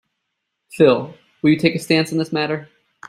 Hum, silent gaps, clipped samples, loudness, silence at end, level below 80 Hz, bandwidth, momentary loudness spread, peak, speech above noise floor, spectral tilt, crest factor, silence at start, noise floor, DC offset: none; none; under 0.1%; -18 LUFS; 0.45 s; -60 dBFS; 14.5 kHz; 9 LU; -2 dBFS; 59 dB; -6 dB/octave; 18 dB; 0.75 s; -76 dBFS; under 0.1%